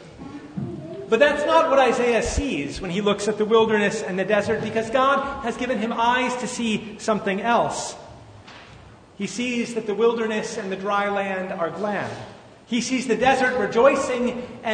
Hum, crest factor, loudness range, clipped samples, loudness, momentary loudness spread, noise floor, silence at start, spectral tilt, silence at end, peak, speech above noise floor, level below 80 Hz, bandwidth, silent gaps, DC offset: none; 20 dB; 6 LU; under 0.1%; -22 LUFS; 14 LU; -46 dBFS; 0 s; -4.5 dB/octave; 0 s; -4 dBFS; 24 dB; -46 dBFS; 9.6 kHz; none; under 0.1%